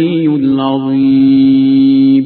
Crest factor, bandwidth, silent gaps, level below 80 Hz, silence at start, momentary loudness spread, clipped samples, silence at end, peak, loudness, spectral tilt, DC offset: 8 dB; 4.4 kHz; none; -52 dBFS; 0 s; 5 LU; under 0.1%; 0 s; -2 dBFS; -10 LUFS; -11.5 dB/octave; under 0.1%